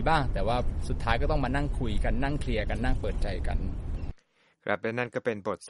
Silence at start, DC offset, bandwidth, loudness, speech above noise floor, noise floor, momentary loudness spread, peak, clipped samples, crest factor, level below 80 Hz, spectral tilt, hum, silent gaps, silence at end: 0 s; under 0.1%; 11.5 kHz; -31 LUFS; 38 dB; -65 dBFS; 8 LU; -10 dBFS; under 0.1%; 18 dB; -32 dBFS; -6.5 dB/octave; none; none; 0 s